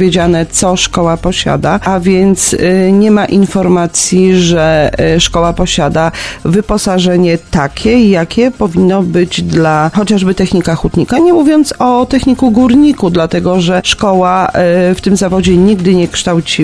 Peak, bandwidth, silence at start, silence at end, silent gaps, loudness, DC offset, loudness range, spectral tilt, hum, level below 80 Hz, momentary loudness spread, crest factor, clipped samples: 0 dBFS; 11 kHz; 0 s; 0 s; none; -9 LUFS; 0.4%; 2 LU; -5 dB/octave; none; -28 dBFS; 4 LU; 8 dB; 0.4%